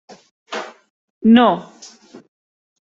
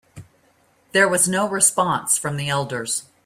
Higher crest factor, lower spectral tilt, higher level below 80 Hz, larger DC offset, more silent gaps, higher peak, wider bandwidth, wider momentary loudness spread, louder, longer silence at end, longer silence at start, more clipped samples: about the same, 18 dB vs 18 dB; first, -6 dB/octave vs -2.5 dB/octave; about the same, -60 dBFS vs -60 dBFS; neither; first, 0.90-1.21 s vs none; about the same, -2 dBFS vs -2 dBFS; second, 7.6 kHz vs 16 kHz; first, 23 LU vs 8 LU; first, -14 LUFS vs -19 LUFS; first, 1.35 s vs 0.25 s; first, 0.5 s vs 0.15 s; neither